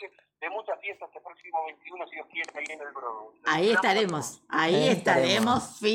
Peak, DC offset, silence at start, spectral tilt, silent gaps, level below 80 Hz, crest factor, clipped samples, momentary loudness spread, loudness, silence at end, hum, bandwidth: -8 dBFS; under 0.1%; 0 s; -4 dB/octave; none; -70 dBFS; 20 dB; under 0.1%; 16 LU; -27 LUFS; 0 s; none; 17 kHz